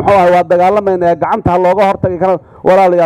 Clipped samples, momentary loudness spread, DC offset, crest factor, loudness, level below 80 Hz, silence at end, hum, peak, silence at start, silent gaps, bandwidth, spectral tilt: under 0.1%; 5 LU; under 0.1%; 10 dB; -11 LUFS; -38 dBFS; 0 s; none; 0 dBFS; 0 s; none; 11.5 kHz; -7.5 dB/octave